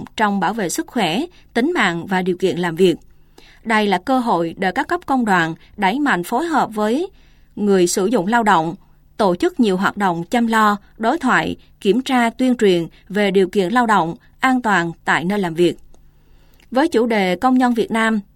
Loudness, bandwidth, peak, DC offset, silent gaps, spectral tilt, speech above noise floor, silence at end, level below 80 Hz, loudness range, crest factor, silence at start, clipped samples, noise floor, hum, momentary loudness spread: -18 LUFS; 16.5 kHz; -2 dBFS; under 0.1%; none; -5 dB/octave; 31 dB; 0.15 s; -50 dBFS; 2 LU; 16 dB; 0 s; under 0.1%; -48 dBFS; none; 7 LU